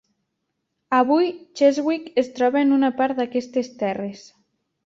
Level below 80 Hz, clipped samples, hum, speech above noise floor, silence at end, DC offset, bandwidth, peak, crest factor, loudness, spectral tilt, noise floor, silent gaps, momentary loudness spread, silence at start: -68 dBFS; under 0.1%; none; 56 dB; 0.65 s; under 0.1%; 7.6 kHz; -4 dBFS; 18 dB; -21 LUFS; -5.5 dB/octave; -77 dBFS; none; 8 LU; 0.9 s